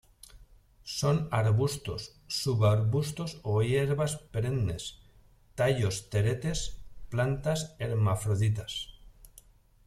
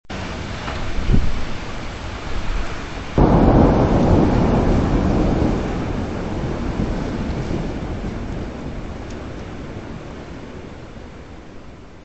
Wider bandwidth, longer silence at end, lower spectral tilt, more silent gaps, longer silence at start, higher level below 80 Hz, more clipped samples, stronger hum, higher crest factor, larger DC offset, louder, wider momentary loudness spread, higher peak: first, 14.5 kHz vs 8.2 kHz; first, 0.6 s vs 0 s; second, -5.5 dB/octave vs -7.5 dB/octave; neither; first, 0.35 s vs 0.1 s; second, -50 dBFS vs -26 dBFS; neither; neither; about the same, 18 dB vs 20 dB; second, under 0.1% vs 0.6%; second, -30 LUFS vs -21 LUFS; second, 12 LU vs 20 LU; second, -14 dBFS vs 0 dBFS